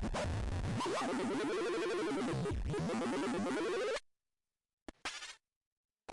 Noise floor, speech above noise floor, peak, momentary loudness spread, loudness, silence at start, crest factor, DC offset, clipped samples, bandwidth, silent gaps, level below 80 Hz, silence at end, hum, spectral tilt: under -90 dBFS; over 54 dB; -30 dBFS; 11 LU; -38 LUFS; 0 s; 8 dB; under 0.1%; under 0.1%; 11.5 kHz; 4.73-4.86 s, 5.56-5.89 s; -50 dBFS; 0 s; none; -5.5 dB/octave